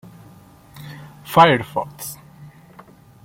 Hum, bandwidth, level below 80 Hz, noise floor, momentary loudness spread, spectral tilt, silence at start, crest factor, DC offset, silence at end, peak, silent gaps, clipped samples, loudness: none; 16.5 kHz; -56 dBFS; -46 dBFS; 25 LU; -5 dB/octave; 0.8 s; 22 dB; under 0.1%; 1.1 s; 0 dBFS; none; under 0.1%; -17 LUFS